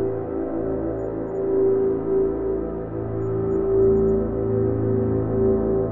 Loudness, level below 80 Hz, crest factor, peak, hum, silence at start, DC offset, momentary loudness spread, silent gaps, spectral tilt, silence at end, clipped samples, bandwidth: -23 LUFS; -38 dBFS; 12 dB; -10 dBFS; none; 0 s; under 0.1%; 8 LU; none; -13 dB/octave; 0 s; under 0.1%; 2.4 kHz